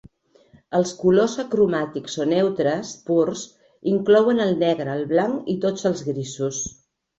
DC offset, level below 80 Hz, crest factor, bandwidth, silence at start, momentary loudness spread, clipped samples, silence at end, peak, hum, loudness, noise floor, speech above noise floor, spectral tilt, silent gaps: under 0.1%; -60 dBFS; 16 dB; 8 kHz; 0.7 s; 11 LU; under 0.1%; 0.45 s; -6 dBFS; none; -22 LUFS; -55 dBFS; 35 dB; -5.5 dB/octave; none